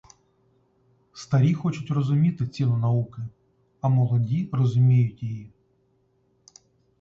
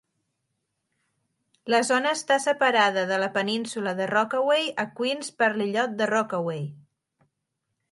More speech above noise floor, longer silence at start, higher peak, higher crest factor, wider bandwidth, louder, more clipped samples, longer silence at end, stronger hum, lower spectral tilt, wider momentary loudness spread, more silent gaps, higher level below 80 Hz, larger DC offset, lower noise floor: second, 44 dB vs 56 dB; second, 1.15 s vs 1.65 s; second, -10 dBFS vs -6 dBFS; second, 14 dB vs 22 dB; second, 7.4 kHz vs 11.5 kHz; about the same, -24 LUFS vs -24 LUFS; neither; first, 1.55 s vs 1.1 s; neither; first, -8.5 dB/octave vs -3.5 dB/octave; first, 14 LU vs 8 LU; neither; first, -58 dBFS vs -78 dBFS; neither; second, -66 dBFS vs -80 dBFS